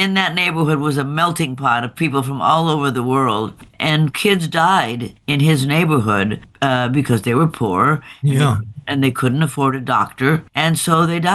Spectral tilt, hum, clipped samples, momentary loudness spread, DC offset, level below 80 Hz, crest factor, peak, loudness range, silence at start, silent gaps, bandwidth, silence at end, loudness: -5.5 dB/octave; none; under 0.1%; 4 LU; under 0.1%; -52 dBFS; 16 dB; -2 dBFS; 1 LU; 0 s; none; 12.5 kHz; 0 s; -17 LUFS